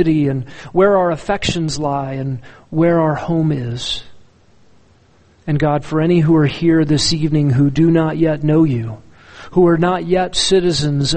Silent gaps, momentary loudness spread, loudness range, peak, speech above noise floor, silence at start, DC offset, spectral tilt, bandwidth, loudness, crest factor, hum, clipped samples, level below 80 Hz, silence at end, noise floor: none; 10 LU; 6 LU; -2 dBFS; 36 dB; 0 s; under 0.1%; -6 dB/octave; 8.8 kHz; -16 LUFS; 14 dB; none; under 0.1%; -40 dBFS; 0 s; -51 dBFS